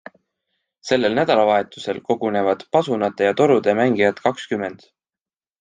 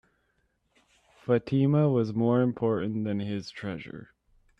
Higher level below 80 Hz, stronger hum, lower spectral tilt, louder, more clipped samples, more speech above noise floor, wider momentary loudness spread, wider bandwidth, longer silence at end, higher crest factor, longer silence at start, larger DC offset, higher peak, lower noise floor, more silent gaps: about the same, -64 dBFS vs -66 dBFS; neither; second, -5.5 dB/octave vs -9 dB/octave; first, -19 LUFS vs -27 LUFS; neither; first, over 71 dB vs 46 dB; second, 10 LU vs 16 LU; first, 9.4 kHz vs 7.4 kHz; first, 0.85 s vs 0.55 s; about the same, 18 dB vs 16 dB; second, 0.85 s vs 1.25 s; neither; first, -2 dBFS vs -12 dBFS; first, under -90 dBFS vs -73 dBFS; neither